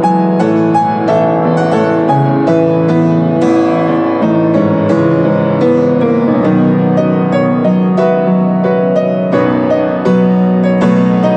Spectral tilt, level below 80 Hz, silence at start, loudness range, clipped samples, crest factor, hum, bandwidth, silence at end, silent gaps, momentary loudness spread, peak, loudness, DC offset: -9 dB/octave; -56 dBFS; 0 s; 0 LU; under 0.1%; 10 dB; none; 8.4 kHz; 0 s; none; 2 LU; 0 dBFS; -11 LUFS; under 0.1%